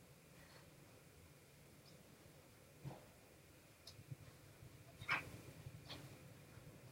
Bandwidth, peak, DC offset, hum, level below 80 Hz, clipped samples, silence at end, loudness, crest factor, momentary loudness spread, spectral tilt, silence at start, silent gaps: 16 kHz; -26 dBFS; under 0.1%; none; -74 dBFS; under 0.1%; 0 s; -54 LUFS; 28 dB; 18 LU; -4 dB/octave; 0 s; none